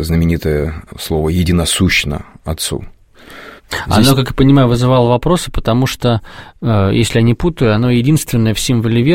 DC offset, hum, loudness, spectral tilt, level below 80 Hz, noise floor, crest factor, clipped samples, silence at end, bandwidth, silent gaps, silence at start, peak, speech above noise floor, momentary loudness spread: under 0.1%; none; -13 LUFS; -5.5 dB/octave; -28 dBFS; -37 dBFS; 14 dB; under 0.1%; 0 s; 16.5 kHz; none; 0 s; 0 dBFS; 24 dB; 12 LU